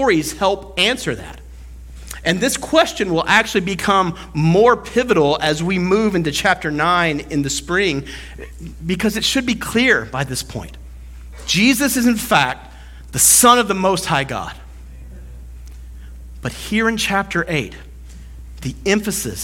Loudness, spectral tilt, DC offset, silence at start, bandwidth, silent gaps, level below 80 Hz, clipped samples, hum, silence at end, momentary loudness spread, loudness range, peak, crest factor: -16 LUFS; -3.5 dB/octave; under 0.1%; 0 s; 17.5 kHz; none; -38 dBFS; under 0.1%; none; 0 s; 22 LU; 8 LU; 0 dBFS; 18 dB